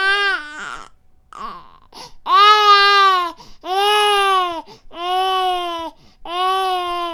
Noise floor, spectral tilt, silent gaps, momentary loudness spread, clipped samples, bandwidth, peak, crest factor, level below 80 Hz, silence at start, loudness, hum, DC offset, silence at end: -46 dBFS; -0.5 dB/octave; none; 23 LU; under 0.1%; 17.5 kHz; 0 dBFS; 18 dB; -50 dBFS; 0 s; -15 LUFS; none; under 0.1%; 0 s